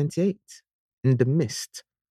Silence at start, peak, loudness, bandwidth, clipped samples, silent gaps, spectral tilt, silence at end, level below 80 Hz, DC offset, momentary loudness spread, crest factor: 0 s; -8 dBFS; -25 LUFS; 14 kHz; under 0.1%; 0.73-0.97 s; -6.5 dB/octave; 0.3 s; -64 dBFS; under 0.1%; 17 LU; 18 dB